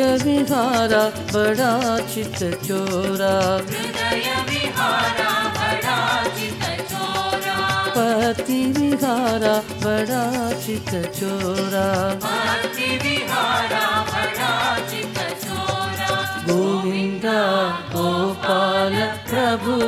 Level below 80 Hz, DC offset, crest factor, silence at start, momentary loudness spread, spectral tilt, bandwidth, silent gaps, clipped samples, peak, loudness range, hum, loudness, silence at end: -52 dBFS; under 0.1%; 16 dB; 0 s; 6 LU; -4 dB/octave; 17 kHz; none; under 0.1%; -6 dBFS; 2 LU; none; -20 LUFS; 0 s